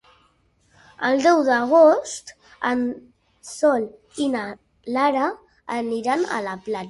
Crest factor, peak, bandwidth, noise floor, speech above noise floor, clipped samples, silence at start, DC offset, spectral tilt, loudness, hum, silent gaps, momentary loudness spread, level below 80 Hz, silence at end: 18 dB; -4 dBFS; 11.5 kHz; -62 dBFS; 42 dB; under 0.1%; 1 s; under 0.1%; -4 dB/octave; -21 LUFS; none; none; 18 LU; -64 dBFS; 0 s